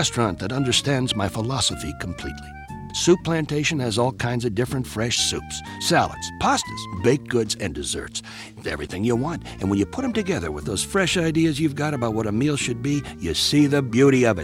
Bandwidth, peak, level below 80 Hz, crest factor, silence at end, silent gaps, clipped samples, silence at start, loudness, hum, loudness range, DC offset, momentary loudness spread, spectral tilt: 16.5 kHz; -6 dBFS; -44 dBFS; 16 dB; 0 s; none; under 0.1%; 0 s; -22 LUFS; none; 4 LU; under 0.1%; 11 LU; -4.5 dB/octave